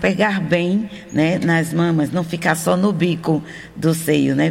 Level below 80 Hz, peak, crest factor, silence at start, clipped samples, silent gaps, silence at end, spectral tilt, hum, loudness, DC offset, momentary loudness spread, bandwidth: -52 dBFS; -4 dBFS; 14 dB; 0 s; under 0.1%; none; 0 s; -6 dB/octave; none; -18 LUFS; under 0.1%; 5 LU; 16.5 kHz